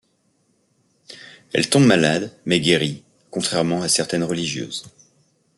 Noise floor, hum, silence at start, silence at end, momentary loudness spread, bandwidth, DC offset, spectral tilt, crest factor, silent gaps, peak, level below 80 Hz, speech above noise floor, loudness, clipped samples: -65 dBFS; none; 1.1 s; 0.7 s; 18 LU; 12 kHz; under 0.1%; -4 dB/octave; 20 dB; none; -2 dBFS; -60 dBFS; 46 dB; -19 LUFS; under 0.1%